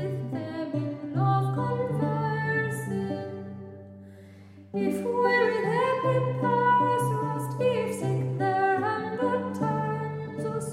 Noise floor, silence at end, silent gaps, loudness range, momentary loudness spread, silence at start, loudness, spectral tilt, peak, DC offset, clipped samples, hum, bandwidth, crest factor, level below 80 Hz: -48 dBFS; 0 s; none; 6 LU; 11 LU; 0 s; -27 LUFS; -7 dB/octave; -12 dBFS; under 0.1%; under 0.1%; none; 14 kHz; 16 dB; -72 dBFS